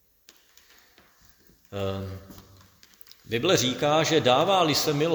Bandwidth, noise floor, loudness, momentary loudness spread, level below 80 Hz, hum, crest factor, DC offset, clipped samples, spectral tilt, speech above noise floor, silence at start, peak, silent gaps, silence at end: over 20 kHz; -58 dBFS; -23 LUFS; 17 LU; -60 dBFS; none; 20 dB; under 0.1%; under 0.1%; -4 dB/octave; 35 dB; 1.7 s; -8 dBFS; none; 0 s